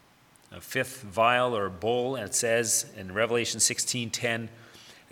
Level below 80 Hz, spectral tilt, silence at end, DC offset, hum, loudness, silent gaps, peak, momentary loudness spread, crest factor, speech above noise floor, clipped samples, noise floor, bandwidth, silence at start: -68 dBFS; -2.5 dB/octave; 0.2 s; under 0.1%; none; -27 LUFS; none; -8 dBFS; 9 LU; 20 dB; 31 dB; under 0.1%; -59 dBFS; 19 kHz; 0.5 s